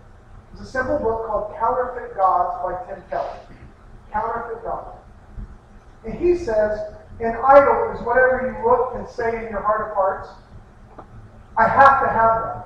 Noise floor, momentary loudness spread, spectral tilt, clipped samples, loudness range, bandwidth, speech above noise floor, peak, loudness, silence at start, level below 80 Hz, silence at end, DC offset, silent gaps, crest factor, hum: -45 dBFS; 19 LU; -7 dB/octave; under 0.1%; 10 LU; 8.4 kHz; 25 dB; 0 dBFS; -19 LUFS; 0.35 s; -42 dBFS; 0 s; under 0.1%; none; 20 dB; none